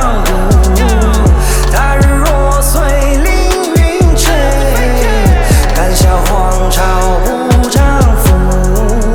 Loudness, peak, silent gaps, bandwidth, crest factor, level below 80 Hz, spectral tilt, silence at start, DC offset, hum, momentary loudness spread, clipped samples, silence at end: -10 LUFS; 0 dBFS; none; 18.5 kHz; 8 dB; -10 dBFS; -5 dB/octave; 0 s; under 0.1%; none; 3 LU; under 0.1%; 0 s